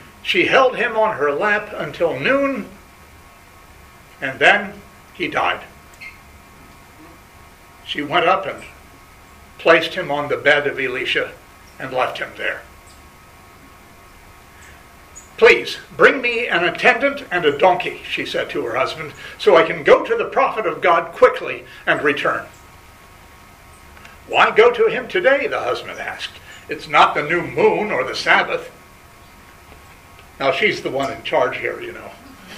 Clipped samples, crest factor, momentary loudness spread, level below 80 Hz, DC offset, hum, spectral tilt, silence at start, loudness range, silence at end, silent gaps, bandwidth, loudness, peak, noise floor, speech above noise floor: under 0.1%; 20 dB; 16 LU; -52 dBFS; under 0.1%; none; -4 dB/octave; 0 s; 8 LU; 0 s; none; 15.5 kHz; -17 LUFS; 0 dBFS; -44 dBFS; 27 dB